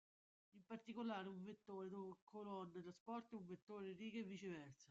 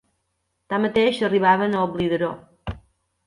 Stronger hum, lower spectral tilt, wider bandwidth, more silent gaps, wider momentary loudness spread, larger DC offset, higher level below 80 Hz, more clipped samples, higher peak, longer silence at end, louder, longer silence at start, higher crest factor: neither; about the same, -5.5 dB/octave vs -6.5 dB/octave; second, 8 kHz vs 11.5 kHz; first, 2.22-2.27 s, 3.00-3.06 s, 3.62-3.67 s vs none; second, 8 LU vs 18 LU; neither; second, under -90 dBFS vs -48 dBFS; neither; second, -38 dBFS vs -6 dBFS; second, 0.05 s vs 0.5 s; second, -54 LUFS vs -21 LUFS; second, 0.55 s vs 0.7 s; about the same, 16 dB vs 18 dB